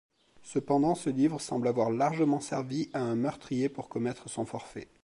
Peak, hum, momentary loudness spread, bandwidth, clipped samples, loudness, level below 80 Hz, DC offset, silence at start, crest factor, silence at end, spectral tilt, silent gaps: -14 dBFS; none; 9 LU; 11.5 kHz; under 0.1%; -31 LUFS; -68 dBFS; under 0.1%; 0.45 s; 16 dB; 0.2 s; -6.5 dB/octave; none